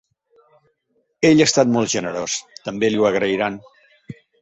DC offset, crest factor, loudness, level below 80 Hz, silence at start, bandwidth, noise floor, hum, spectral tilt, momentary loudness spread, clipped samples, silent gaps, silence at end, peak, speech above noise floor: under 0.1%; 18 dB; -18 LUFS; -58 dBFS; 1.2 s; 8.4 kHz; -68 dBFS; none; -4 dB/octave; 12 LU; under 0.1%; none; 0.3 s; -2 dBFS; 50 dB